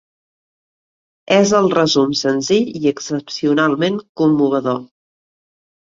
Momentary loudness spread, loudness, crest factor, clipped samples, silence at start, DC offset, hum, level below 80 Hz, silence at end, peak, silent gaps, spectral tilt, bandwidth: 8 LU; -16 LUFS; 16 dB; under 0.1%; 1.3 s; under 0.1%; none; -60 dBFS; 1 s; 0 dBFS; 4.09-4.15 s; -5 dB/octave; 7.6 kHz